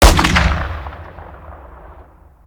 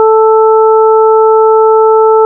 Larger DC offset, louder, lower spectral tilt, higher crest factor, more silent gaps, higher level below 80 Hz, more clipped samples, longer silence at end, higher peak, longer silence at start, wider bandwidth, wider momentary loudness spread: neither; second, -15 LUFS vs -6 LUFS; second, -4 dB/octave vs -8 dB/octave; first, 16 dB vs 4 dB; neither; first, -20 dBFS vs under -90 dBFS; neither; first, 0.55 s vs 0 s; about the same, 0 dBFS vs 0 dBFS; about the same, 0 s vs 0 s; first, over 20 kHz vs 1.4 kHz; first, 25 LU vs 0 LU